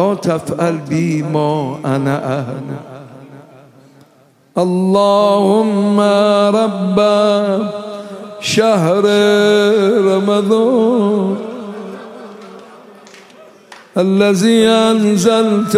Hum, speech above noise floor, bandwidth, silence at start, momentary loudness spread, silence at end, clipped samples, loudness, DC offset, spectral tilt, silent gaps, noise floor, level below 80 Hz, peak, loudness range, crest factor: none; 37 dB; 15 kHz; 0 s; 17 LU; 0 s; under 0.1%; -13 LUFS; under 0.1%; -6 dB/octave; none; -50 dBFS; -60 dBFS; 0 dBFS; 8 LU; 14 dB